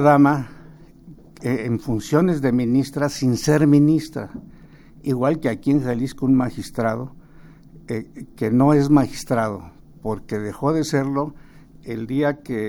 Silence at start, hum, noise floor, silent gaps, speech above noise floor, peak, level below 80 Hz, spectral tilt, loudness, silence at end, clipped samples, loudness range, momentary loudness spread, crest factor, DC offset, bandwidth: 0 s; none; -45 dBFS; none; 26 dB; -2 dBFS; -46 dBFS; -7 dB/octave; -21 LUFS; 0 s; under 0.1%; 4 LU; 16 LU; 18 dB; under 0.1%; 17 kHz